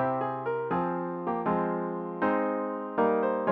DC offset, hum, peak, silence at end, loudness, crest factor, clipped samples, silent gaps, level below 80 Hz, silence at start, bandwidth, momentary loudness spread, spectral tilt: under 0.1%; none; -14 dBFS; 0 s; -29 LUFS; 16 dB; under 0.1%; none; -66 dBFS; 0 s; 4.9 kHz; 6 LU; -10 dB/octave